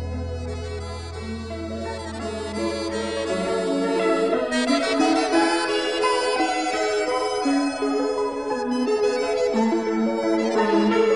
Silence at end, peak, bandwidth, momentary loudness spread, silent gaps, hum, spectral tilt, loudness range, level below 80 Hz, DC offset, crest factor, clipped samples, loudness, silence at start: 0 s; -8 dBFS; 10.5 kHz; 11 LU; none; none; -4.5 dB/octave; 6 LU; -44 dBFS; under 0.1%; 14 dB; under 0.1%; -23 LUFS; 0 s